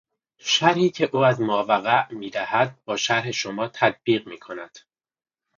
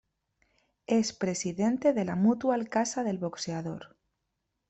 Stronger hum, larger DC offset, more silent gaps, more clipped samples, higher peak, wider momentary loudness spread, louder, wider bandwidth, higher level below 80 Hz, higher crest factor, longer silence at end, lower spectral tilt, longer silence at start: neither; neither; neither; neither; first, -2 dBFS vs -12 dBFS; first, 15 LU vs 10 LU; first, -22 LUFS vs -29 LUFS; second, 7.6 kHz vs 8.4 kHz; about the same, -68 dBFS vs -68 dBFS; about the same, 22 dB vs 18 dB; about the same, 0.8 s vs 0.85 s; about the same, -4 dB/octave vs -5 dB/octave; second, 0.45 s vs 0.9 s